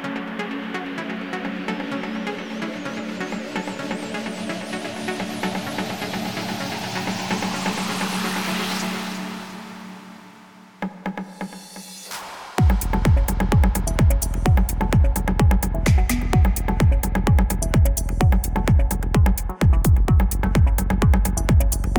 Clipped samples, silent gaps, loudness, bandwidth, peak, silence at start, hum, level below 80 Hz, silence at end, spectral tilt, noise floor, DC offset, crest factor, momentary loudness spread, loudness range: under 0.1%; none; -22 LUFS; 19 kHz; -4 dBFS; 0 s; none; -24 dBFS; 0 s; -5.5 dB/octave; -46 dBFS; under 0.1%; 16 dB; 13 LU; 9 LU